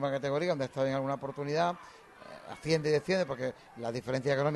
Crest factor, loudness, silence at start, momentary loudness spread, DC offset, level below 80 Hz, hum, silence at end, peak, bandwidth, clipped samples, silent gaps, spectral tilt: 16 dB; -32 LUFS; 0 s; 17 LU; under 0.1%; -66 dBFS; none; 0 s; -16 dBFS; 12 kHz; under 0.1%; none; -6 dB/octave